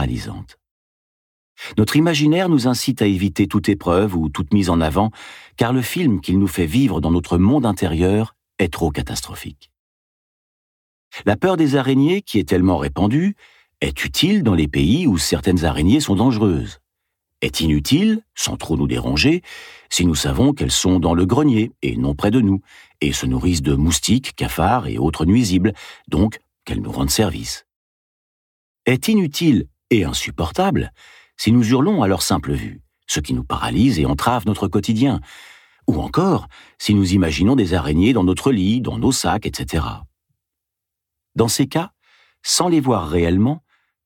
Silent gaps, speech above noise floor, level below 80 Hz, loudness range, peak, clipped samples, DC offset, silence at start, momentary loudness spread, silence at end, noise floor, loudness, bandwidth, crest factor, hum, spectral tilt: 0.71-1.56 s, 9.79-11.11 s, 27.76-28.75 s; 65 dB; -34 dBFS; 4 LU; -2 dBFS; under 0.1%; under 0.1%; 0 s; 9 LU; 0.5 s; -82 dBFS; -18 LUFS; 18 kHz; 18 dB; none; -5.5 dB/octave